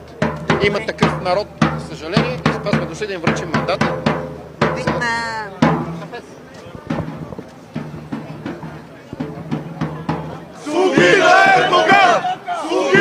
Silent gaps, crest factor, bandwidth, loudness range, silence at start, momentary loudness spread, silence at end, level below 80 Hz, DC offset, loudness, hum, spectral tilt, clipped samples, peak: none; 18 dB; 14.5 kHz; 15 LU; 0 s; 21 LU; 0 s; -48 dBFS; under 0.1%; -17 LUFS; none; -5 dB/octave; under 0.1%; 0 dBFS